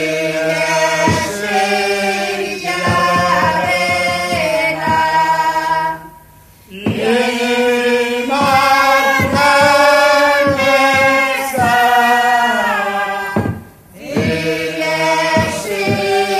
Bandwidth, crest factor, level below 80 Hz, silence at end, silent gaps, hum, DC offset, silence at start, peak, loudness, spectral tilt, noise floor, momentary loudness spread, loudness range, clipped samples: 15 kHz; 14 dB; -48 dBFS; 0 s; none; none; under 0.1%; 0 s; 0 dBFS; -13 LUFS; -4 dB/octave; -43 dBFS; 8 LU; 5 LU; under 0.1%